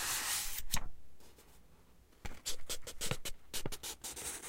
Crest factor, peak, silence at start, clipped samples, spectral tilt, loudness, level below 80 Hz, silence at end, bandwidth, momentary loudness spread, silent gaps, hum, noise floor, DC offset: 22 dB; -16 dBFS; 0 s; under 0.1%; -1 dB/octave; -40 LUFS; -50 dBFS; 0 s; 16.5 kHz; 16 LU; none; none; -63 dBFS; under 0.1%